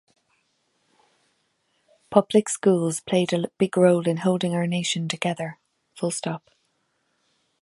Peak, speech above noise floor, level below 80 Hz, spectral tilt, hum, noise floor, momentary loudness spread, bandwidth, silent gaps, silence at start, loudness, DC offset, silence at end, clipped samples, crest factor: -2 dBFS; 49 dB; -70 dBFS; -5 dB/octave; none; -71 dBFS; 11 LU; 11.5 kHz; none; 2.1 s; -23 LUFS; under 0.1%; 1.25 s; under 0.1%; 24 dB